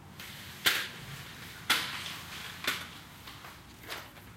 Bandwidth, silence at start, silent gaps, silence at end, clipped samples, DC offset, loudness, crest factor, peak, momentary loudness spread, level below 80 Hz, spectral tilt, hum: 16.5 kHz; 0 s; none; 0 s; under 0.1%; under 0.1%; -34 LUFS; 28 dB; -10 dBFS; 18 LU; -64 dBFS; -1 dB/octave; none